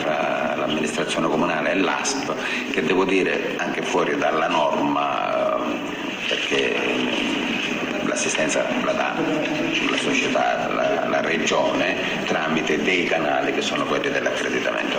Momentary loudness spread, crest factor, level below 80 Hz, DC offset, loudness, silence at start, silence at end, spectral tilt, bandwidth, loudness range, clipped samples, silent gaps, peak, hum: 4 LU; 14 dB; -56 dBFS; under 0.1%; -21 LUFS; 0 s; 0 s; -3.5 dB/octave; 16 kHz; 1 LU; under 0.1%; none; -8 dBFS; none